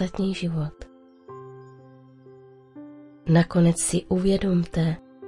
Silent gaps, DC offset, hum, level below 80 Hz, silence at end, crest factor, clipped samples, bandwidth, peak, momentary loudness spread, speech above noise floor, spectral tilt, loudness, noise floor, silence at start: none; under 0.1%; none; -46 dBFS; 0 s; 18 dB; under 0.1%; 11.5 kHz; -6 dBFS; 24 LU; 27 dB; -6 dB/octave; -23 LUFS; -49 dBFS; 0 s